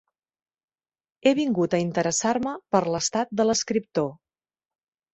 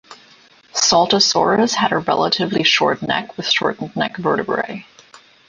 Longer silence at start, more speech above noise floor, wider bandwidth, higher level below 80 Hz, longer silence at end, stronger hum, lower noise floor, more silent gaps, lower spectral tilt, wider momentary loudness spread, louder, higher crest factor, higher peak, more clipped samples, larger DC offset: first, 1.25 s vs 0.1 s; first, over 66 dB vs 32 dB; second, 8.2 kHz vs 10 kHz; second, -62 dBFS vs -56 dBFS; first, 1 s vs 0.3 s; neither; first, under -90 dBFS vs -49 dBFS; neither; first, -4 dB/octave vs -2.5 dB/octave; second, 5 LU vs 9 LU; second, -24 LUFS vs -17 LUFS; about the same, 20 dB vs 16 dB; second, -6 dBFS vs -2 dBFS; neither; neither